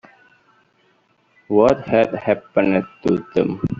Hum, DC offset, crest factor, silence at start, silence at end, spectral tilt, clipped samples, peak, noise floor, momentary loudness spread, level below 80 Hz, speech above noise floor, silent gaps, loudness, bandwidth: none; under 0.1%; 18 dB; 1.5 s; 0 s; -6.5 dB/octave; under 0.1%; -2 dBFS; -60 dBFS; 6 LU; -52 dBFS; 42 dB; none; -19 LUFS; 7.6 kHz